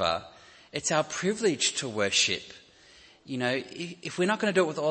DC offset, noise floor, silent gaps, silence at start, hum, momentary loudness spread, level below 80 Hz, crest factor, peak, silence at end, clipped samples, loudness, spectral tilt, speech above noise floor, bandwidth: under 0.1%; -56 dBFS; none; 0 s; none; 13 LU; -66 dBFS; 18 dB; -10 dBFS; 0 s; under 0.1%; -28 LUFS; -3 dB/octave; 27 dB; 8.8 kHz